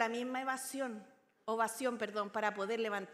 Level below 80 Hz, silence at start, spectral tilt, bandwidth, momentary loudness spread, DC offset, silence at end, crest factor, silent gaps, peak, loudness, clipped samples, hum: under -90 dBFS; 0 s; -3 dB/octave; 16 kHz; 6 LU; under 0.1%; 0 s; 20 dB; none; -18 dBFS; -38 LUFS; under 0.1%; none